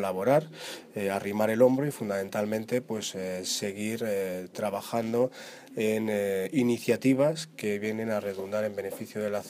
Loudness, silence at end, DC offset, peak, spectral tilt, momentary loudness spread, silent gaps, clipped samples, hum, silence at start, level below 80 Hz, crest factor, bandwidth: -29 LUFS; 0 s; under 0.1%; -10 dBFS; -5 dB/octave; 9 LU; none; under 0.1%; none; 0 s; -74 dBFS; 20 dB; 15.5 kHz